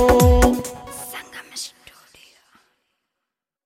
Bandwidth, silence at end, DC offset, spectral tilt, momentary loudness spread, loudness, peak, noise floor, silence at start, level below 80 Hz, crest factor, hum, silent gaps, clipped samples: 16.5 kHz; 2 s; under 0.1%; -5.5 dB/octave; 20 LU; -19 LUFS; -2 dBFS; -83 dBFS; 0 s; -28 dBFS; 20 dB; none; none; under 0.1%